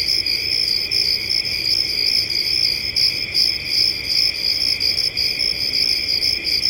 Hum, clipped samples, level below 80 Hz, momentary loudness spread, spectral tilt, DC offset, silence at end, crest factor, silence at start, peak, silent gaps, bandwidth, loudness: none; under 0.1%; -46 dBFS; 1 LU; -0.5 dB/octave; under 0.1%; 0 s; 16 dB; 0 s; -4 dBFS; none; 17 kHz; -16 LUFS